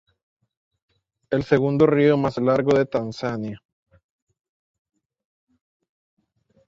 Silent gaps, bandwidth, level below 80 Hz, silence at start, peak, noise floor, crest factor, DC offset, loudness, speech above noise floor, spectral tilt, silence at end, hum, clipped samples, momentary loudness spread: none; 7.6 kHz; -58 dBFS; 1.3 s; -4 dBFS; -64 dBFS; 22 dB; under 0.1%; -21 LUFS; 45 dB; -8 dB/octave; 3.1 s; none; under 0.1%; 11 LU